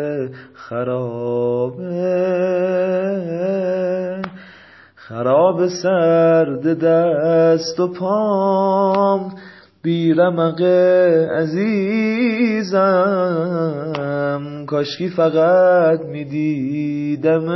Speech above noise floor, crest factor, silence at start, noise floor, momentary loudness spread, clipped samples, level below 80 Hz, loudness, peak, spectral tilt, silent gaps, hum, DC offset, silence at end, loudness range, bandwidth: 28 dB; 14 dB; 0 s; -45 dBFS; 10 LU; under 0.1%; -64 dBFS; -17 LUFS; -2 dBFS; -7 dB/octave; none; none; under 0.1%; 0 s; 4 LU; 6.2 kHz